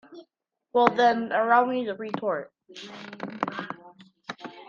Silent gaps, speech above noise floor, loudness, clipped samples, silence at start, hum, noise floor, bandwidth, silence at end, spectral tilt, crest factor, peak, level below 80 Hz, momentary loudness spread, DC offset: none; 54 dB; -25 LUFS; under 0.1%; 0.1 s; none; -78 dBFS; 7.2 kHz; 0.05 s; -5.5 dB/octave; 26 dB; -2 dBFS; -74 dBFS; 21 LU; under 0.1%